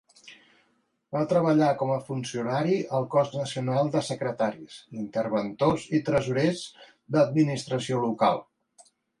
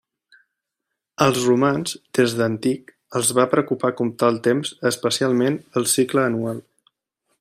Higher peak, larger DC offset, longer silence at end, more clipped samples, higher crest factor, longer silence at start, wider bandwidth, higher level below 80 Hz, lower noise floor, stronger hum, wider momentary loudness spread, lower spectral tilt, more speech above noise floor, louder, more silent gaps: second, -10 dBFS vs -2 dBFS; neither; about the same, 0.8 s vs 0.8 s; neither; about the same, 18 dB vs 20 dB; second, 0.25 s vs 1.2 s; second, 11.5 kHz vs 16 kHz; about the same, -62 dBFS vs -62 dBFS; second, -71 dBFS vs -82 dBFS; neither; about the same, 10 LU vs 8 LU; first, -6.5 dB/octave vs -4.5 dB/octave; second, 45 dB vs 62 dB; second, -26 LUFS vs -20 LUFS; neither